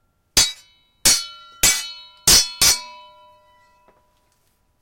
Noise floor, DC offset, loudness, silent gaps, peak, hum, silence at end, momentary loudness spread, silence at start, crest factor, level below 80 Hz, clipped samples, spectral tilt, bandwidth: -64 dBFS; under 0.1%; -16 LUFS; none; -2 dBFS; none; 1.9 s; 10 LU; 0.35 s; 20 dB; -42 dBFS; under 0.1%; 0.5 dB/octave; 16.5 kHz